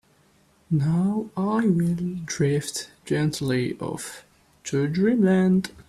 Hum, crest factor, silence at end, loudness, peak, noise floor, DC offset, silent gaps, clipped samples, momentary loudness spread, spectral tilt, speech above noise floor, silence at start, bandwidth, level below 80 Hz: none; 14 dB; 0.2 s; -24 LUFS; -10 dBFS; -60 dBFS; under 0.1%; none; under 0.1%; 12 LU; -6.5 dB/octave; 37 dB; 0.7 s; 13.5 kHz; -58 dBFS